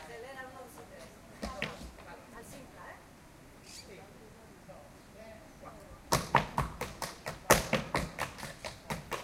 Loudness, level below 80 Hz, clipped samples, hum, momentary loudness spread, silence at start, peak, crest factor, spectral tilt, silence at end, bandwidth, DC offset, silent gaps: -34 LUFS; -52 dBFS; under 0.1%; none; 24 LU; 0 s; 0 dBFS; 38 dB; -3.5 dB/octave; 0 s; 16.5 kHz; under 0.1%; none